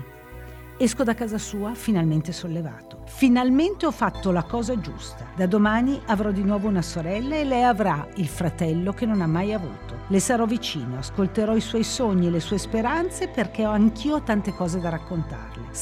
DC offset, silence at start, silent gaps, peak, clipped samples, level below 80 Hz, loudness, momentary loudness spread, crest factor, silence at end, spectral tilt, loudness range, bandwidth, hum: under 0.1%; 0 s; none; -6 dBFS; under 0.1%; -42 dBFS; -24 LUFS; 12 LU; 16 dB; 0 s; -6 dB/octave; 2 LU; 18 kHz; none